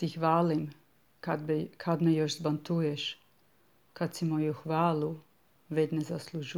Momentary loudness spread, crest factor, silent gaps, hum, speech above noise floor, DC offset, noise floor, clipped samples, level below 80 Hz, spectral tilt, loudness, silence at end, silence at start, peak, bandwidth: 10 LU; 18 dB; none; none; 37 dB; under 0.1%; -68 dBFS; under 0.1%; -76 dBFS; -6.5 dB/octave; -31 LUFS; 0 s; 0 s; -14 dBFS; 14.5 kHz